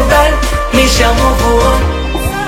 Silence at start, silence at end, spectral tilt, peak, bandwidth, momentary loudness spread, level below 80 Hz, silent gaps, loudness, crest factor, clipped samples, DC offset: 0 s; 0 s; -4.5 dB/octave; 0 dBFS; 16.5 kHz; 6 LU; -14 dBFS; none; -11 LUFS; 10 dB; 0.3%; under 0.1%